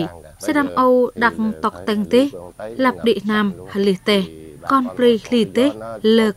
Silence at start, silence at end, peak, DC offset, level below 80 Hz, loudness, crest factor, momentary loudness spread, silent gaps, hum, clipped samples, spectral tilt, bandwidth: 0 s; 0.05 s; -2 dBFS; under 0.1%; -52 dBFS; -18 LUFS; 16 dB; 8 LU; none; none; under 0.1%; -5.5 dB/octave; 15 kHz